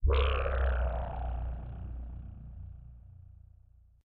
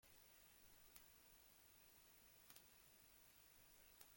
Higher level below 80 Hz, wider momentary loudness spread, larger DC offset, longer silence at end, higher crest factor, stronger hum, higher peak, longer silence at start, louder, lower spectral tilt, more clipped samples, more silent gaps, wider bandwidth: first, -34 dBFS vs -84 dBFS; first, 24 LU vs 2 LU; neither; first, 0.65 s vs 0 s; second, 16 dB vs 32 dB; neither; first, -18 dBFS vs -36 dBFS; about the same, 0 s vs 0 s; first, -34 LUFS vs -67 LUFS; first, -5 dB/octave vs -1.5 dB/octave; neither; neither; second, 4.3 kHz vs 17 kHz